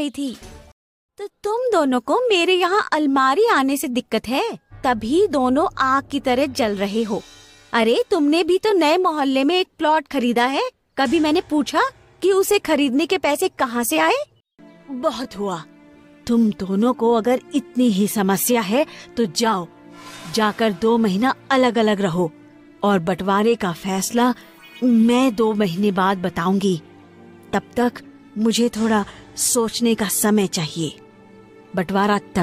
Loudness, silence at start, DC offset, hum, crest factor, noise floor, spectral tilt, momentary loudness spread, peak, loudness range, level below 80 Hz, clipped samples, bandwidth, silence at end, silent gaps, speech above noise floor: -19 LUFS; 0 s; under 0.1%; none; 14 dB; -48 dBFS; -4.5 dB/octave; 10 LU; -4 dBFS; 3 LU; -54 dBFS; under 0.1%; 16 kHz; 0 s; 0.72-1.09 s; 30 dB